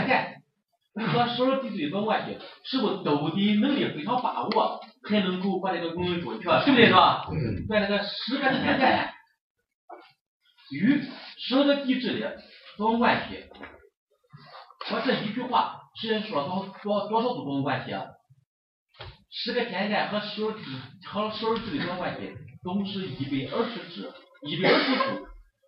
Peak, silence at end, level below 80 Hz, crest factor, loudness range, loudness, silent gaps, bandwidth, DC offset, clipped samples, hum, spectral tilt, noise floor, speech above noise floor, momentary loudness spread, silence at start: -4 dBFS; 0.25 s; -58 dBFS; 24 dB; 8 LU; -26 LUFS; 9.41-9.55 s, 9.74-9.88 s, 10.21-10.40 s, 13.97-14.07 s, 18.46-18.87 s; 5.8 kHz; under 0.1%; under 0.1%; none; -8.5 dB/octave; -76 dBFS; 49 dB; 17 LU; 0 s